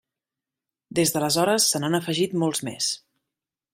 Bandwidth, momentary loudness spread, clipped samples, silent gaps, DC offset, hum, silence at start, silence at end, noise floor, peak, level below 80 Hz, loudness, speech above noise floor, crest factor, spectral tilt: 16 kHz; 7 LU; under 0.1%; none; under 0.1%; none; 0.9 s; 0.75 s; -89 dBFS; -8 dBFS; -66 dBFS; -23 LUFS; 65 dB; 18 dB; -3.5 dB/octave